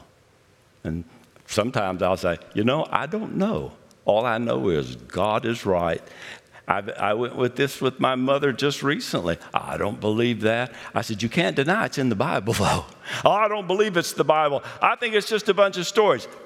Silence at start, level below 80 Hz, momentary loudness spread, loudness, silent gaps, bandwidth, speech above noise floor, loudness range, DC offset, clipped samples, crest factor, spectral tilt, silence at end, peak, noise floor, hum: 0.85 s; -56 dBFS; 8 LU; -23 LUFS; none; 16 kHz; 35 dB; 4 LU; under 0.1%; under 0.1%; 24 dB; -5 dB/octave; 0 s; 0 dBFS; -58 dBFS; none